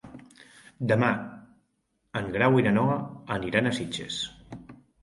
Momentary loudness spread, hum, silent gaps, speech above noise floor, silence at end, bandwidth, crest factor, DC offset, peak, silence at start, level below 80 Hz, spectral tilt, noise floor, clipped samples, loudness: 22 LU; none; none; 49 dB; 0.3 s; 11.5 kHz; 20 dB; under 0.1%; -8 dBFS; 0.05 s; -58 dBFS; -6 dB/octave; -74 dBFS; under 0.1%; -27 LUFS